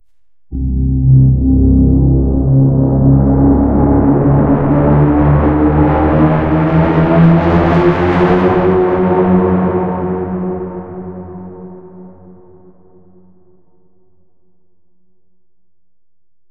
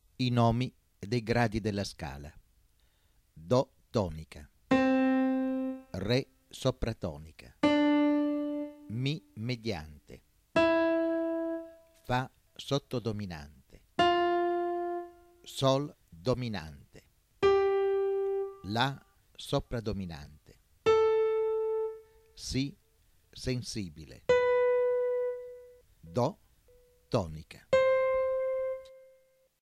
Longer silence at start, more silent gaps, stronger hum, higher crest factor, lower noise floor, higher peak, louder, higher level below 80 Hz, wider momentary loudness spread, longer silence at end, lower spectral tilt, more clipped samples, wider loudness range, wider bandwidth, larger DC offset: first, 0.5 s vs 0.2 s; neither; neither; second, 12 dB vs 18 dB; first, -76 dBFS vs -68 dBFS; first, 0 dBFS vs -14 dBFS; first, -11 LUFS vs -31 LUFS; first, -22 dBFS vs -54 dBFS; about the same, 14 LU vs 16 LU; first, 4.4 s vs 0.65 s; first, -11 dB/octave vs -6.5 dB/octave; neither; first, 11 LU vs 3 LU; second, 4.9 kHz vs 15 kHz; first, 0.7% vs under 0.1%